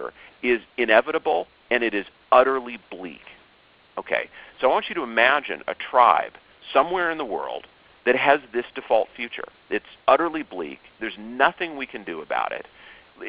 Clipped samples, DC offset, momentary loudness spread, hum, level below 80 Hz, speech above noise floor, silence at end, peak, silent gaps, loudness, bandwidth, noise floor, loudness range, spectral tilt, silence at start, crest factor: under 0.1%; under 0.1%; 17 LU; none; -60 dBFS; 33 dB; 0 s; -2 dBFS; none; -23 LUFS; 5.2 kHz; -56 dBFS; 4 LU; -0.5 dB/octave; 0 s; 22 dB